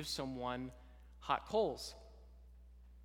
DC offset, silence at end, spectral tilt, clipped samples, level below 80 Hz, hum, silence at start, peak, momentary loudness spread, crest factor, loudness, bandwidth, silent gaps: under 0.1%; 0 s; -4 dB/octave; under 0.1%; -58 dBFS; none; 0 s; -20 dBFS; 25 LU; 22 dB; -40 LUFS; 18 kHz; none